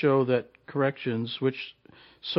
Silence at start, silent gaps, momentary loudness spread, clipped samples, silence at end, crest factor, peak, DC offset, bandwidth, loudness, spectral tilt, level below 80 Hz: 0 s; none; 15 LU; under 0.1%; 0 s; 16 dB; -12 dBFS; under 0.1%; 5.8 kHz; -28 LUFS; -9 dB/octave; -74 dBFS